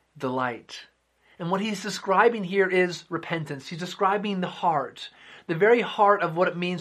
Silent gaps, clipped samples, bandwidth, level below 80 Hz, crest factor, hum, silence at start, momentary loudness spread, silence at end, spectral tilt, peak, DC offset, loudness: none; under 0.1%; 14 kHz; -74 dBFS; 20 dB; none; 0.15 s; 15 LU; 0 s; -5.5 dB/octave; -6 dBFS; under 0.1%; -25 LUFS